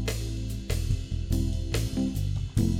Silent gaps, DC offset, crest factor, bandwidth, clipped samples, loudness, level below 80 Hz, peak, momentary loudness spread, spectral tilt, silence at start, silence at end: none; under 0.1%; 16 dB; 16.5 kHz; under 0.1%; -30 LUFS; -32 dBFS; -12 dBFS; 4 LU; -6 dB/octave; 0 s; 0 s